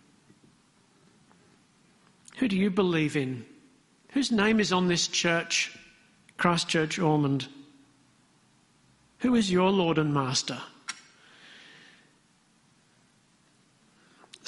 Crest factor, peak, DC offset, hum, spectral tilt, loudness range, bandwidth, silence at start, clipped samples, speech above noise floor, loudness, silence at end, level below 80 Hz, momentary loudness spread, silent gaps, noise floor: 24 dB; -6 dBFS; under 0.1%; none; -4.5 dB/octave; 6 LU; 11.5 kHz; 2.35 s; under 0.1%; 39 dB; -26 LUFS; 3.55 s; -64 dBFS; 17 LU; none; -65 dBFS